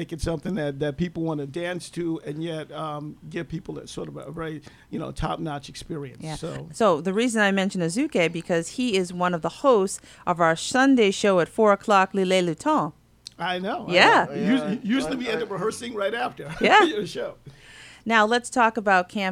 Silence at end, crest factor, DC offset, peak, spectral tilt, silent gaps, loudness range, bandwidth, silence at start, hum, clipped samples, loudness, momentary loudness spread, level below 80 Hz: 0 s; 22 dB; under 0.1%; -2 dBFS; -4.5 dB/octave; none; 12 LU; 15 kHz; 0 s; none; under 0.1%; -23 LUFS; 16 LU; -50 dBFS